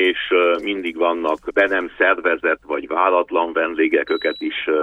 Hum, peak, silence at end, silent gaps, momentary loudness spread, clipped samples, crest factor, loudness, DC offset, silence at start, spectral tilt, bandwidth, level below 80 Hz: none; -2 dBFS; 0 s; none; 6 LU; under 0.1%; 16 dB; -19 LUFS; under 0.1%; 0 s; -4.5 dB/octave; 7 kHz; -56 dBFS